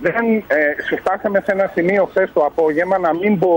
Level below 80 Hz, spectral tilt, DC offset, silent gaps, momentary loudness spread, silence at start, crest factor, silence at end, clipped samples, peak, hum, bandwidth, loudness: -52 dBFS; -8 dB/octave; under 0.1%; none; 2 LU; 0 s; 12 dB; 0 s; under 0.1%; -4 dBFS; none; 16.5 kHz; -17 LUFS